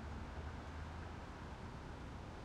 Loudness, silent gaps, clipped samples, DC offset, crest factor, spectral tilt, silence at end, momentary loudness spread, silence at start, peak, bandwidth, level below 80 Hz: -50 LUFS; none; under 0.1%; under 0.1%; 12 dB; -6.5 dB/octave; 0 s; 2 LU; 0 s; -36 dBFS; 11.5 kHz; -54 dBFS